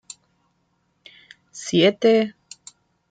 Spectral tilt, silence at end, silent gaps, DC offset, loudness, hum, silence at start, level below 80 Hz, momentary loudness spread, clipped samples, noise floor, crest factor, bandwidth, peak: -4.5 dB/octave; 0.8 s; none; under 0.1%; -19 LUFS; none; 1.55 s; -70 dBFS; 26 LU; under 0.1%; -68 dBFS; 20 dB; 9.4 kHz; -4 dBFS